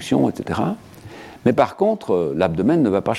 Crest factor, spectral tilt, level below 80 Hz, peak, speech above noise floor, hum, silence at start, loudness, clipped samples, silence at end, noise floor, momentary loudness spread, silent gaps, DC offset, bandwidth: 18 dB; -7 dB/octave; -50 dBFS; -2 dBFS; 20 dB; none; 0 s; -20 LUFS; under 0.1%; 0 s; -39 dBFS; 17 LU; none; under 0.1%; 14 kHz